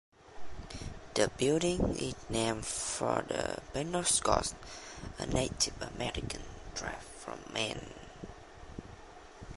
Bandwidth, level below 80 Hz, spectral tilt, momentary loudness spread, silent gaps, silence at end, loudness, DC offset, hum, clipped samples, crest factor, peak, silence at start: 11.5 kHz; -50 dBFS; -3.5 dB/octave; 20 LU; none; 0 s; -34 LUFS; under 0.1%; none; under 0.1%; 26 dB; -10 dBFS; 0.2 s